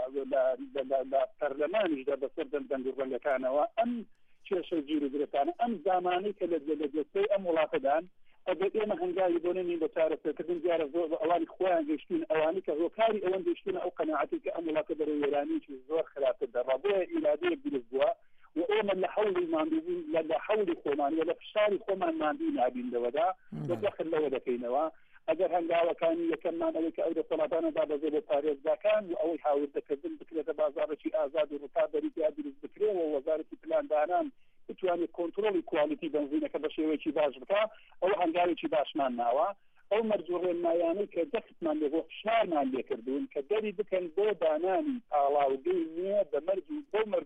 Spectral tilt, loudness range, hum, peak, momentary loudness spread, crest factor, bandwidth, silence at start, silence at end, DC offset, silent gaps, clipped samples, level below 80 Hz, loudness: -7.5 dB/octave; 2 LU; none; -18 dBFS; 6 LU; 14 dB; 4.7 kHz; 0 s; 0 s; under 0.1%; none; under 0.1%; -72 dBFS; -32 LUFS